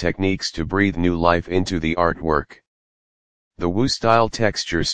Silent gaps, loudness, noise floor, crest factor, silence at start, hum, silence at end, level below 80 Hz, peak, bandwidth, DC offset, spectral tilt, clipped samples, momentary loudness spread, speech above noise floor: 2.67-3.51 s; -20 LUFS; under -90 dBFS; 20 dB; 0 s; none; 0 s; -40 dBFS; 0 dBFS; 9.8 kHz; 2%; -5 dB/octave; under 0.1%; 6 LU; over 70 dB